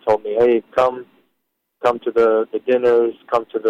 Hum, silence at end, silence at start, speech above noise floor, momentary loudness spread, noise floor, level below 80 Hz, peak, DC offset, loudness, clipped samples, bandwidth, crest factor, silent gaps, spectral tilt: none; 0 s; 0.05 s; 56 dB; 6 LU; -73 dBFS; -60 dBFS; -4 dBFS; under 0.1%; -18 LUFS; under 0.1%; 7.6 kHz; 14 dB; none; -6.5 dB/octave